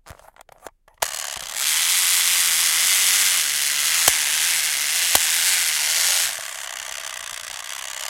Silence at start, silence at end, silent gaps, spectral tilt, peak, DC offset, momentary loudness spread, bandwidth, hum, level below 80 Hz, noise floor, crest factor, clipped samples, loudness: 0.05 s; 0 s; none; 3 dB/octave; 0 dBFS; under 0.1%; 14 LU; 17 kHz; none; -60 dBFS; -49 dBFS; 22 dB; under 0.1%; -17 LUFS